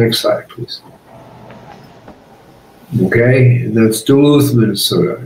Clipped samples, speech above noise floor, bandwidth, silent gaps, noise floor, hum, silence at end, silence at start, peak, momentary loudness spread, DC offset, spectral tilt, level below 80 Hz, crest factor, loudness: under 0.1%; 30 dB; 16 kHz; none; -42 dBFS; none; 0 s; 0 s; 0 dBFS; 17 LU; under 0.1%; -6 dB/octave; -50 dBFS; 12 dB; -12 LUFS